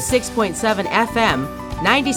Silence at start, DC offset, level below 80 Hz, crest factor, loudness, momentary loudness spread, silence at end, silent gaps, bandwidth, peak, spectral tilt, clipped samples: 0 s; under 0.1%; -38 dBFS; 18 dB; -19 LUFS; 5 LU; 0 s; none; 19 kHz; 0 dBFS; -3.5 dB/octave; under 0.1%